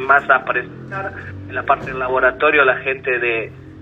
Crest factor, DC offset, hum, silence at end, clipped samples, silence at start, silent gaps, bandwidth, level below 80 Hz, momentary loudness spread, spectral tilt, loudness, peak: 18 dB; under 0.1%; none; 0 s; under 0.1%; 0 s; none; 7.6 kHz; -48 dBFS; 15 LU; -6.5 dB/octave; -17 LUFS; 0 dBFS